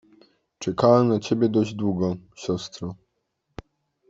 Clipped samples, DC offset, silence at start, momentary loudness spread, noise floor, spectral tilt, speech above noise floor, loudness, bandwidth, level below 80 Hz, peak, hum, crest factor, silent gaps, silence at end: under 0.1%; under 0.1%; 0.6 s; 15 LU; -76 dBFS; -7 dB/octave; 53 dB; -23 LUFS; 7.8 kHz; -58 dBFS; -4 dBFS; none; 22 dB; none; 1.15 s